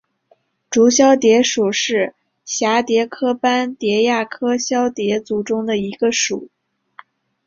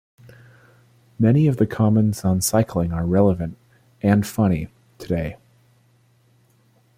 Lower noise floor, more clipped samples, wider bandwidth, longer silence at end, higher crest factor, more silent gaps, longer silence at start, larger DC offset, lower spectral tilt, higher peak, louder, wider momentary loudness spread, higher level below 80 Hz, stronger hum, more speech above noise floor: about the same, -59 dBFS vs -59 dBFS; neither; second, 7.6 kHz vs 16 kHz; second, 1 s vs 1.6 s; about the same, 16 dB vs 16 dB; neither; second, 0.7 s vs 1.2 s; neither; second, -3 dB/octave vs -7 dB/octave; first, -2 dBFS vs -6 dBFS; first, -17 LUFS vs -20 LUFS; about the same, 9 LU vs 10 LU; second, -62 dBFS vs -46 dBFS; neither; about the same, 43 dB vs 40 dB